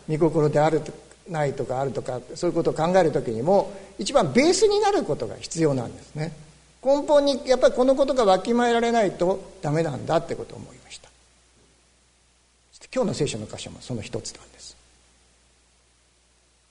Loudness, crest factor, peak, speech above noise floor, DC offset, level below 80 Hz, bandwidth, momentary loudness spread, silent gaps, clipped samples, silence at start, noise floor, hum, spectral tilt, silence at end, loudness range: -23 LUFS; 18 dB; -6 dBFS; 39 dB; under 0.1%; -50 dBFS; 11 kHz; 17 LU; none; under 0.1%; 0.1 s; -62 dBFS; none; -5.5 dB/octave; 2 s; 12 LU